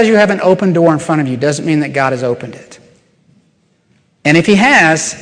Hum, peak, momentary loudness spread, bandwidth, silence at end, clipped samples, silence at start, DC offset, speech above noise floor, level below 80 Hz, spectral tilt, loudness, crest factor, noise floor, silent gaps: none; 0 dBFS; 10 LU; 10.5 kHz; 0 s; under 0.1%; 0 s; under 0.1%; 45 dB; -52 dBFS; -5 dB/octave; -11 LUFS; 12 dB; -56 dBFS; none